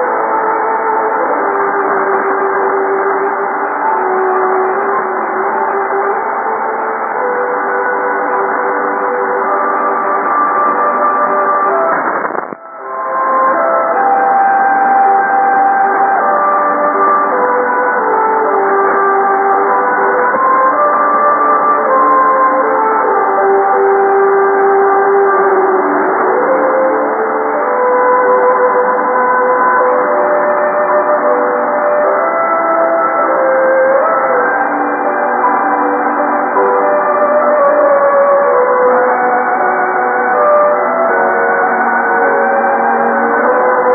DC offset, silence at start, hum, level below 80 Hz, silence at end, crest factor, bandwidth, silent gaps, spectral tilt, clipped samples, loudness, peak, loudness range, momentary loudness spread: under 0.1%; 0 s; none; -64 dBFS; 0 s; 10 dB; 2.6 kHz; none; -12.5 dB/octave; under 0.1%; -11 LUFS; 0 dBFS; 4 LU; 4 LU